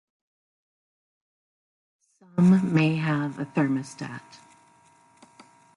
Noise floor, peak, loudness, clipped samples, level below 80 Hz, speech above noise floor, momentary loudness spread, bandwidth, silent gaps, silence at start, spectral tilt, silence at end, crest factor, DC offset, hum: -59 dBFS; -10 dBFS; -24 LUFS; under 0.1%; -70 dBFS; 35 dB; 18 LU; 11 kHz; none; 2.35 s; -7.5 dB/octave; 1.55 s; 18 dB; under 0.1%; none